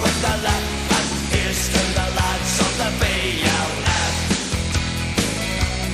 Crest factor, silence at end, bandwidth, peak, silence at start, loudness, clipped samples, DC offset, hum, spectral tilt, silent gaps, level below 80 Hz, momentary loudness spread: 16 dB; 0 s; 15.5 kHz; -4 dBFS; 0 s; -20 LUFS; under 0.1%; under 0.1%; none; -3.5 dB/octave; none; -28 dBFS; 3 LU